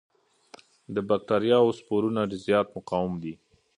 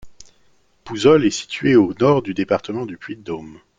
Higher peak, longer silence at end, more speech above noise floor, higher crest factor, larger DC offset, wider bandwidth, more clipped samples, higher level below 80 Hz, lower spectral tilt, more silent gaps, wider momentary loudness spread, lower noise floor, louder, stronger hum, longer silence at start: second, -8 dBFS vs -2 dBFS; first, 0.45 s vs 0.25 s; second, 29 dB vs 43 dB; about the same, 18 dB vs 18 dB; neither; first, 10.5 kHz vs 9.2 kHz; neither; second, -60 dBFS vs -54 dBFS; about the same, -7 dB/octave vs -6 dB/octave; neither; second, 11 LU vs 17 LU; second, -54 dBFS vs -60 dBFS; second, -26 LUFS vs -17 LUFS; neither; first, 0.9 s vs 0.05 s